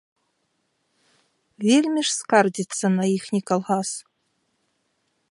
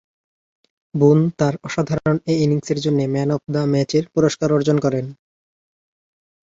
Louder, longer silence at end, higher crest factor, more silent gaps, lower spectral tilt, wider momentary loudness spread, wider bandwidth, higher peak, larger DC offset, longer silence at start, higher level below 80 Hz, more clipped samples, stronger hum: second, -22 LUFS vs -19 LUFS; second, 1.3 s vs 1.45 s; about the same, 22 dB vs 18 dB; neither; second, -4.5 dB/octave vs -7 dB/octave; about the same, 7 LU vs 7 LU; first, 11.5 kHz vs 7.8 kHz; about the same, -2 dBFS vs -2 dBFS; neither; first, 1.6 s vs 0.95 s; second, -76 dBFS vs -54 dBFS; neither; neither